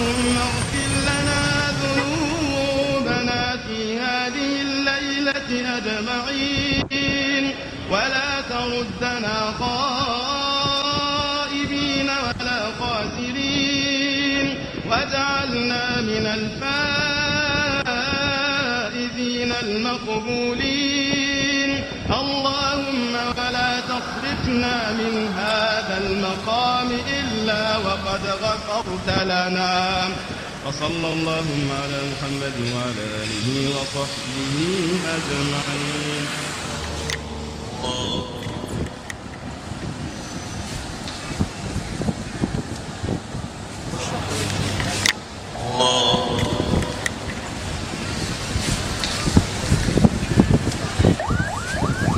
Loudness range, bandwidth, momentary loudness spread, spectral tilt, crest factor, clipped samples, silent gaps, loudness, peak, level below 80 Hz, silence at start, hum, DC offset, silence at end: 7 LU; 16 kHz; 9 LU; -4 dB/octave; 22 dB; under 0.1%; none; -22 LUFS; 0 dBFS; -38 dBFS; 0 s; none; under 0.1%; 0 s